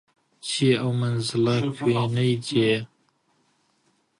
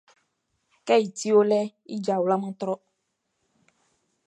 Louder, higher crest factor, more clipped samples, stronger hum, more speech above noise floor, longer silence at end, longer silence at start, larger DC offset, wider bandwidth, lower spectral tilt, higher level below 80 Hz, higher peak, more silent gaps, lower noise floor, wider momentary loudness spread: about the same, -23 LUFS vs -24 LUFS; about the same, 16 dB vs 20 dB; neither; neither; second, 45 dB vs 54 dB; second, 1.35 s vs 1.5 s; second, 0.45 s vs 0.85 s; neither; about the same, 11.5 kHz vs 11 kHz; about the same, -6 dB/octave vs -5.5 dB/octave; first, -62 dBFS vs -82 dBFS; about the same, -8 dBFS vs -8 dBFS; neither; second, -67 dBFS vs -77 dBFS; second, 7 LU vs 12 LU